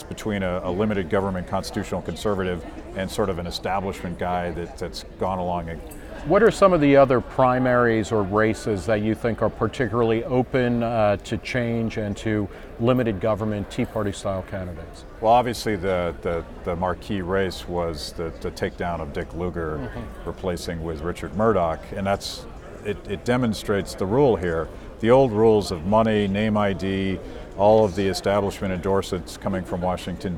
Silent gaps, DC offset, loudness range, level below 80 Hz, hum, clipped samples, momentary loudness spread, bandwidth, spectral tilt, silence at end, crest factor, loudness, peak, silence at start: none; under 0.1%; 8 LU; -40 dBFS; none; under 0.1%; 13 LU; 16.5 kHz; -6.5 dB/octave; 0 s; 20 dB; -23 LUFS; -4 dBFS; 0 s